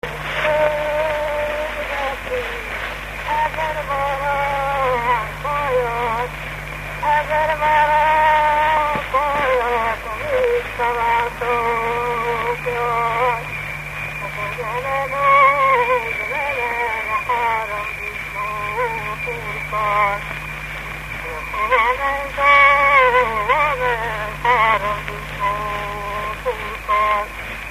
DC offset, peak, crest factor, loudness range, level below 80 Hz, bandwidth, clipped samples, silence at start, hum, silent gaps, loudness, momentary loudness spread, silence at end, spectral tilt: under 0.1%; 0 dBFS; 20 dB; 7 LU; -38 dBFS; 15 kHz; under 0.1%; 0.05 s; none; none; -19 LUFS; 11 LU; 0 s; -4 dB/octave